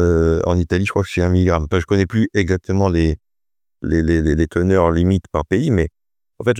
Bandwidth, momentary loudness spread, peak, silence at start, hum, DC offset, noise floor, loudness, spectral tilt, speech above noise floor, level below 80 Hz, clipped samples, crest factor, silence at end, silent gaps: 9.8 kHz; 5 LU; -2 dBFS; 0 s; none; under 0.1%; under -90 dBFS; -18 LUFS; -7.5 dB/octave; over 74 dB; -34 dBFS; under 0.1%; 16 dB; 0 s; none